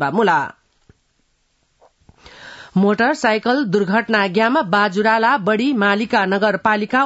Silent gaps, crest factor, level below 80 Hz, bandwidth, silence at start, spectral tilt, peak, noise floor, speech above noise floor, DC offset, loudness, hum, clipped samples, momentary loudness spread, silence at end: none; 16 dB; -60 dBFS; 8 kHz; 0 s; -6 dB/octave; -2 dBFS; -64 dBFS; 48 dB; under 0.1%; -16 LUFS; none; under 0.1%; 3 LU; 0 s